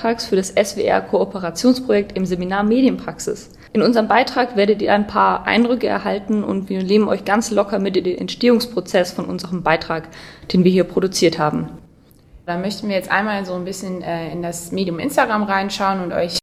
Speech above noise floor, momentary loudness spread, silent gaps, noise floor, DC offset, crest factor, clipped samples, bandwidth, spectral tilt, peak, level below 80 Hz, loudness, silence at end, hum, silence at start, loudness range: 31 dB; 10 LU; none; -49 dBFS; under 0.1%; 18 dB; under 0.1%; 15.5 kHz; -5 dB/octave; 0 dBFS; -48 dBFS; -18 LUFS; 0.05 s; none; 0 s; 4 LU